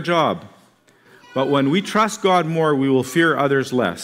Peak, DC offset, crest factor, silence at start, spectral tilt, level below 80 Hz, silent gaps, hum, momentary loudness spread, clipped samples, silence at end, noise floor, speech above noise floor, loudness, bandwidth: -4 dBFS; under 0.1%; 14 dB; 0 s; -5.5 dB/octave; -66 dBFS; none; none; 5 LU; under 0.1%; 0 s; -54 dBFS; 36 dB; -18 LUFS; 16 kHz